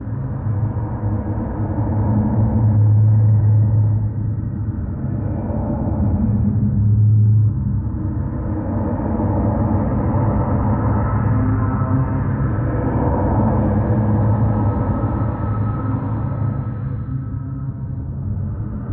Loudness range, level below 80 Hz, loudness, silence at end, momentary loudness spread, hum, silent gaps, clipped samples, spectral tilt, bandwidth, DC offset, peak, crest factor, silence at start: 4 LU; -28 dBFS; -19 LUFS; 0 s; 10 LU; none; none; under 0.1%; -14.5 dB/octave; 2.4 kHz; under 0.1%; -6 dBFS; 12 dB; 0 s